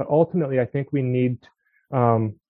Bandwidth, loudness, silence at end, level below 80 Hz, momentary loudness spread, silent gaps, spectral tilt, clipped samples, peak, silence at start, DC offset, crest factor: 4 kHz; -22 LUFS; 0.15 s; -60 dBFS; 6 LU; none; -12 dB/octave; under 0.1%; -4 dBFS; 0 s; under 0.1%; 18 dB